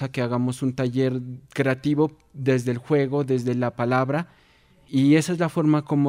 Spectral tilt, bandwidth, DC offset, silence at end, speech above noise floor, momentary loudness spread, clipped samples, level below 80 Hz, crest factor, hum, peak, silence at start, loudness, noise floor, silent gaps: -7 dB/octave; 15.5 kHz; under 0.1%; 0 s; 34 dB; 7 LU; under 0.1%; -60 dBFS; 16 dB; none; -6 dBFS; 0 s; -23 LUFS; -57 dBFS; none